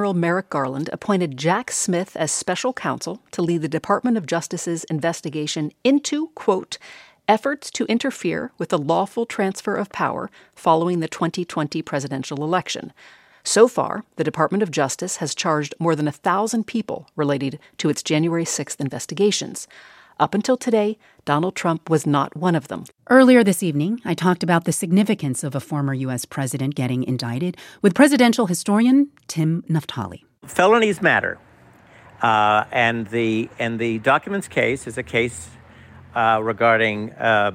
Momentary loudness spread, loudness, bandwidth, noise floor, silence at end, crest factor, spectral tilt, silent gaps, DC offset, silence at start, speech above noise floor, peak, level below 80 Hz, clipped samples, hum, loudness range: 11 LU; -21 LUFS; 16.5 kHz; -50 dBFS; 0 s; 20 dB; -5 dB/octave; none; under 0.1%; 0 s; 29 dB; -2 dBFS; -62 dBFS; under 0.1%; none; 5 LU